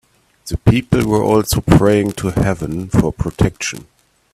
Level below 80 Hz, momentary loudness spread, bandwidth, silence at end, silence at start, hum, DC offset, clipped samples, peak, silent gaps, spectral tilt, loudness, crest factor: -30 dBFS; 12 LU; 15.5 kHz; 0.5 s; 0.45 s; none; under 0.1%; under 0.1%; 0 dBFS; none; -6.5 dB/octave; -16 LUFS; 16 dB